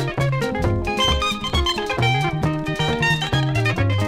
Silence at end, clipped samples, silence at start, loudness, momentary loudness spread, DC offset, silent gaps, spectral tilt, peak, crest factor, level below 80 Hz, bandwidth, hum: 0 s; under 0.1%; 0 s; -20 LUFS; 3 LU; under 0.1%; none; -5 dB/octave; -6 dBFS; 14 dB; -32 dBFS; 15.5 kHz; none